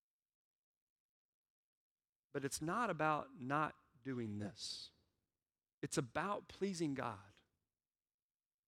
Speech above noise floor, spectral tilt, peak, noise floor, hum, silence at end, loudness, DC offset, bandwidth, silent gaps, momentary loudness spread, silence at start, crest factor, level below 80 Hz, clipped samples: over 48 dB; -4.5 dB/octave; -22 dBFS; under -90 dBFS; none; 1.35 s; -43 LUFS; under 0.1%; 16 kHz; 5.73-5.82 s; 11 LU; 2.35 s; 22 dB; -76 dBFS; under 0.1%